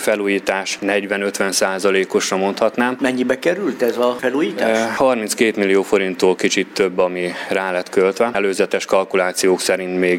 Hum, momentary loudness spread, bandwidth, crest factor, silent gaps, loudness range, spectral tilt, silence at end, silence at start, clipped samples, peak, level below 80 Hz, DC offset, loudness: none; 3 LU; 16.5 kHz; 18 dB; none; 1 LU; -3.5 dB/octave; 0 s; 0 s; under 0.1%; 0 dBFS; -60 dBFS; under 0.1%; -18 LUFS